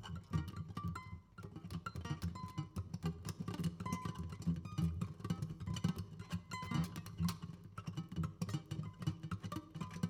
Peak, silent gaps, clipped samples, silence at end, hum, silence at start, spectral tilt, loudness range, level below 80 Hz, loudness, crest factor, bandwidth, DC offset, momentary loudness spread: -24 dBFS; none; under 0.1%; 0 s; none; 0 s; -6.5 dB/octave; 3 LU; -58 dBFS; -44 LUFS; 20 dB; 17.5 kHz; under 0.1%; 7 LU